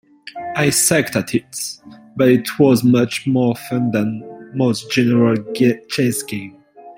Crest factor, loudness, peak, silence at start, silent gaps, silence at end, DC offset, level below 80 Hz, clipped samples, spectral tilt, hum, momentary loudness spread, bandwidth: 16 dB; -17 LUFS; 0 dBFS; 0.25 s; none; 0.05 s; under 0.1%; -56 dBFS; under 0.1%; -5 dB/octave; none; 15 LU; 16.5 kHz